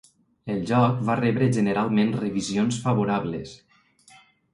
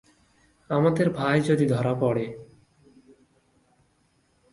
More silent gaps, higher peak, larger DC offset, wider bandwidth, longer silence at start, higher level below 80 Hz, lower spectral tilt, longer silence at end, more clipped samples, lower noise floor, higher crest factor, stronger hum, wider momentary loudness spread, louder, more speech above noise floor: neither; about the same, -6 dBFS vs -8 dBFS; neither; about the same, 11 kHz vs 11.5 kHz; second, 0.45 s vs 0.7 s; about the same, -58 dBFS vs -60 dBFS; about the same, -6.5 dB/octave vs -7.5 dB/octave; second, 1 s vs 2.1 s; neither; second, -56 dBFS vs -67 dBFS; about the same, 18 dB vs 20 dB; neither; about the same, 11 LU vs 9 LU; about the same, -24 LUFS vs -24 LUFS; second, 33 dB vs 44 dB